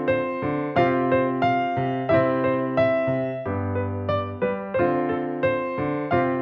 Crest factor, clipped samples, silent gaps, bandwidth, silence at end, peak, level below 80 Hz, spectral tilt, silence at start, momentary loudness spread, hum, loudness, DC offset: 18 dB; under 0.1%; none; 5.8 kHz; 0 s; -6 dBFS; -56 dBFS; -9.5 dB/octave; 0 s; 6 LU; none; -23 LUFS; under 0.1%